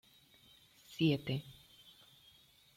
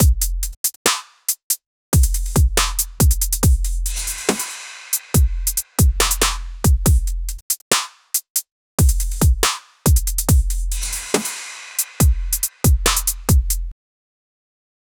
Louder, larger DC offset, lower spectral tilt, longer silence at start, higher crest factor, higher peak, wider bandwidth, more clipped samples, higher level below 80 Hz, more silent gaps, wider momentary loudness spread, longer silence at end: second, -36 LUFS vs -19 LUFS; neither; first, -7 dB/octave vs -3.5 dB/octave; first, 0.9 s vs 0 s; about the same, 20 dB vs 18 dB; second, -20 dBFS vs 0 dBFS; second, 16.5 kHz vs over 20 kHz; neither; second, -72 dBFS vs -22 dBFS; second, none vs 0.57-0.64 s, 0.76-0.85 s, 1.43-1.50 s, 1.66-1.92 s, 7.42-7.50 s, 7.62-7.71 s, 8.30-8.35 s, 8.52-8.78 s; first, 26 LU vs 7 LU; about the same, 1.25 s vs 1.25 s